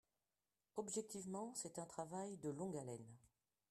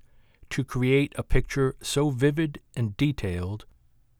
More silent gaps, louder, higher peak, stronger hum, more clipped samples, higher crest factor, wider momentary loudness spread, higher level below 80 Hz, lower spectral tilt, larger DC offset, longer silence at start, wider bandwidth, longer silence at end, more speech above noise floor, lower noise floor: neither; second, -49 LUFS vs -27 LUFS; second, -32 dBFS vs -8 dBFS; neither; neither; about the same, 18 dB vs 18 dB; about the same, 8 LU vs 9 LU; second, -84 dBFS vs -36 dBFS; about the same, -5 dB/octave vs -6 dB/octave; neither; first, 0.75 s vs 0.5 s; second, 13.5 kHz vs 16 kHz; about the same, 0.45 s vs 0.55 s; first, over 41 dB vs 34 dB; first, under -90 dBFS vs -60 dBFS